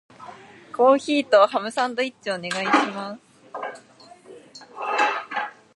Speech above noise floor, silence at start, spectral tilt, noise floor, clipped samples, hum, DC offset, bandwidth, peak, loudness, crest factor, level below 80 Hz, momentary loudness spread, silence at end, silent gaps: 28 dB; 0.2 s; -3.5 dB/octave; -49 dBFS; under 0.1%; none; under 0.1%; 11.5 kHz; -2 dBFS; -22 LUFS; 22 dB; -78 dBFS; 25 LU; 0.25 s; none